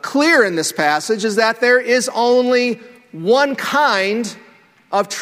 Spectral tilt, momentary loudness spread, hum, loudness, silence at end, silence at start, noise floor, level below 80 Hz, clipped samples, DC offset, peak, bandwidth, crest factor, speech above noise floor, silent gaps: -3 dB/octave; 9 LU; none; -16 LUFS; 0 s; 0.05 s; -49 dBFS; -66 dBFS; under 0.1%; under 0.1%; 0 dBFS; 16 kHz; 16 dB; 33 dB; none